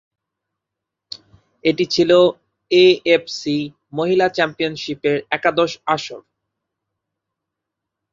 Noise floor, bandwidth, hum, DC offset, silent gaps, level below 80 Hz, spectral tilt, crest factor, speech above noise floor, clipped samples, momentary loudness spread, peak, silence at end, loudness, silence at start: -83 dBFS; 7.6 kHz; none; under 0.1%; none; -62 dBFS; -5 dB/octave; 18 dB; 66 dB; under 0.1%; 15 LU; -2 dBFS; 1.95 s; -18 LUFS; 1.65 s